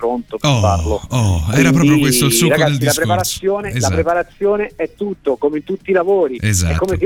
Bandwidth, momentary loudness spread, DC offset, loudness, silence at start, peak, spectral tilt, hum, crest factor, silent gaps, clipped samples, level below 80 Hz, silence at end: 17.5 kHz; 8 LU; 0.1%; -15 LUFS; 0 s; 0 dBFS; -5 dB/octave; none; 14 dB; none; under 0.1%; -32 dBFS; 0 s